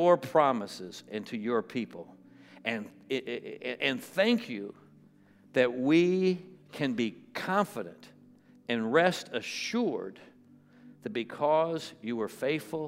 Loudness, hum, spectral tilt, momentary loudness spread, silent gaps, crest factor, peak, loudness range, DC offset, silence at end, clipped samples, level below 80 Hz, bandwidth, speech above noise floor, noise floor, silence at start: -30 LUFS; none; -5.5 dB/octave; 15 LU; none; 20 dB; -10 dBFS; 4 LU; under 0.1%; 0 s; under 0.1%; -84 dBFS; 16 kHz; 29 dB; -59 dBFS; 0 s